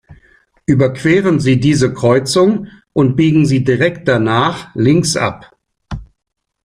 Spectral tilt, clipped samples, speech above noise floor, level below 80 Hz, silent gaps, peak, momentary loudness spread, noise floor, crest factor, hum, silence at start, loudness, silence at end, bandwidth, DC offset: -6 dB/octave; under 0.1%; 38 dB; -42 dBFS; none; 0 dBFS; 10 LU; -51 dBFS; 14 dB; none; 0.1 s; -13 LUFS; 0.6 s; 15 kHz; under 0.1%